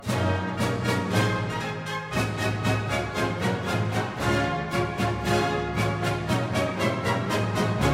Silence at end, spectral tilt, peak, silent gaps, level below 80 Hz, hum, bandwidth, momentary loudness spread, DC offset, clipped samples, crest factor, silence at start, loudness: 0 s; -5.5 dB/octave; -10 dBFS; none; -44 dBFS; none; 16 kHz; 3 LU; under 0.1%; under 0.1%; 16 dB; 0 s; -26 LUFS